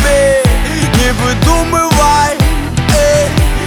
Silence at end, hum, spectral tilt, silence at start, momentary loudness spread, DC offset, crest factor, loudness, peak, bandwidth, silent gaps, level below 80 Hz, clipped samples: 0 s; none; -4.5 dB/octave; 0 s; 4 LU; under 0.1%; 10 dB; -11 LUFS; 0 dBFS; 19.5 kHz; none; -16 dBFS; under 0.1%